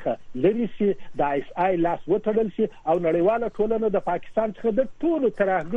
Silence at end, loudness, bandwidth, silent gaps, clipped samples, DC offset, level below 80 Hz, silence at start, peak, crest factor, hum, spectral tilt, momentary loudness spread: 0 s; -24 LUFS; 7.2 kHz; none; under 0.1%; under 0.1%; -50 dBFS; 0 s; -8 dBFS; 16 dB; none; -9 dB/octave; 4 LU